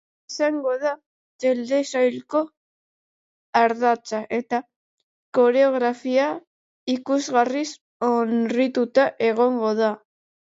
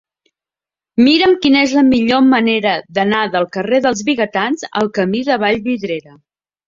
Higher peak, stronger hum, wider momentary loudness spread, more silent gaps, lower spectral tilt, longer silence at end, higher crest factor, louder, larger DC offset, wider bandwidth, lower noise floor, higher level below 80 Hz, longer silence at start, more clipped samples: second, -4 dBFS vs 0 dBFS; neither; about the same, 9 LU vs 7 LU; first, 1.06-1.39 s, 2.57-3.53 s, 4.76-5.33 s, 6.47-6.87 s, 7.81-8.00 s vs none; about the same, -4 dB/octave vs -4.5 dB/octave; about the same, 0.6 s vs 0.65 s; about the same, 18 dB vs 14 dB; second, -22 LUFS vs -14 LUFS; neither; about the same, 8 kHz vs 7.6 kHz; about the same, under -90 dBFS vs -89 dBFS; second, -76 dBFS vs -52 dBFS; second, 0.3 s vs 0.95 s; neither